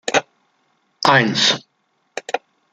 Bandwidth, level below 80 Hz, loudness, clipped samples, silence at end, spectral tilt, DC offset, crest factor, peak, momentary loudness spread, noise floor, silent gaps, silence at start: 13 kHz; -64 dBFS; -17 LUFS; under 0.1%; 0.35 s; -3 dB/octave; under 0.1%; 20 dB; 0 dBFS; 16 LU; -67 dBFS; none; 0.05 s